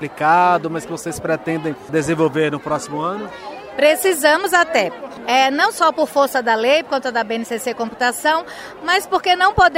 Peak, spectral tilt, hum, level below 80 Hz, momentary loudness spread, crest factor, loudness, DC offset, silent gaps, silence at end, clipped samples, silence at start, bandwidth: 0 dBFS; -3.5 dB/octave; none; -48 dBFS; 11 LU; 18 dB; -17 LUFS; under 0.1%; none; 0 s; under 0.1%; 0 s; 16 kHz